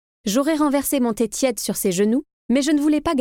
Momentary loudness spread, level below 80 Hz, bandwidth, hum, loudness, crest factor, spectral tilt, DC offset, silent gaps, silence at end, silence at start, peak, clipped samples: 4 LU; -50 dBFS; 17.5 kHz; none; -20 LUFS; 14 dB; -4 dB/octave; under 0.1%; 2.33-2.49 s; 0 s; 0.25 s; -6 dBFS; under 0.1%